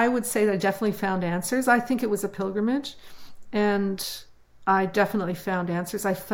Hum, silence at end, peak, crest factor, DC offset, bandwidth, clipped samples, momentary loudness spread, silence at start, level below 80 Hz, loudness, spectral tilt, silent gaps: none; 0 s; -8 dBFS; 18 dB; under 0.1%; 17 kHz; under 0.1%; 9 LU; 0 s; -58 dBFS; -25 LUFS; -5 dB/octave; none